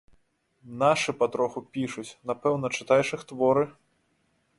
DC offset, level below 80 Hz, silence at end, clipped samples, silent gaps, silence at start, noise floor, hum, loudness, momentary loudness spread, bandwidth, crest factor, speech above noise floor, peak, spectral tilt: under 0.1%; -68 dBFS; 0.85 s; under 0.1%; none; 0.65 s; -71 dBFS; none; -27 LUFS; 10 LU; 11.5 kHz; 20 dB; 44 dB; -8 dBFS; -5 dB/octave